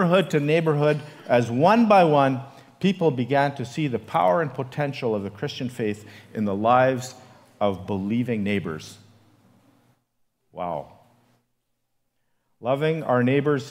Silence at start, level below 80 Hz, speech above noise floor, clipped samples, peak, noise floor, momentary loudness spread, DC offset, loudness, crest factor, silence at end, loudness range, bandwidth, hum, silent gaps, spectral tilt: 0 s; -66 dBFS; 52 dB; under 0.1%; -4 dBFS; -74 dBFS; 12 LU; under 0.1%; -23 LUFS; 20 dB; 0 s; 17 LU; 15.5 kHz; none; none; -7 dB/octave